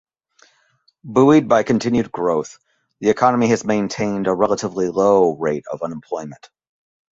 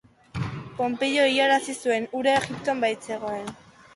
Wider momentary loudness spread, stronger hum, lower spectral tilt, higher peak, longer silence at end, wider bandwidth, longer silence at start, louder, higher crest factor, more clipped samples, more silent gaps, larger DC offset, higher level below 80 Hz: about the same, 14 LU vs 13 LU; neither; first, -6 dB/octave vs -4 dB/octave; first, 0 dBFS vs -8 dBFS; first, 0.75 s vs 0.4 s; second, 8 kHz vs 11.5 kHz; first, 1.05 s vs 0.35 s; first, -18 LUFS vs -25 LUFS; about the same, 18 dB vs 16 dB; neither; neither; neither; about the same, -56 dBFS vs -56 dBFS